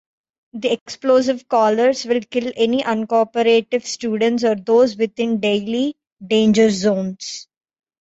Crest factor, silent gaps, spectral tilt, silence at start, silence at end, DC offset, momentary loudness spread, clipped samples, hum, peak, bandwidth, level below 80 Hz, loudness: 14 dB; 0.81-0.86 s, 6.12-6.16 s; -5 dB/octave; 0.55 s; 0.6 s; under 0.1%; 9 LU; under 0.1%; none; -4 dBFS; 8.2 kHz; -60 dBFS; -18 LUFS